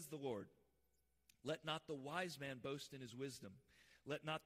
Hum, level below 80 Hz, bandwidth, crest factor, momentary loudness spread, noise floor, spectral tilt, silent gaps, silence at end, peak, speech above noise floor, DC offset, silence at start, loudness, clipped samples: none; -82 dBFS; 15.5 kHz; 20 dB; 14 LU; -84 dBFS; -4.5 dB/octave; none; 0.05 s; -30 dBFS; 35 dB; under 0.1%; 0 s; -49 LUFS; under 0.1%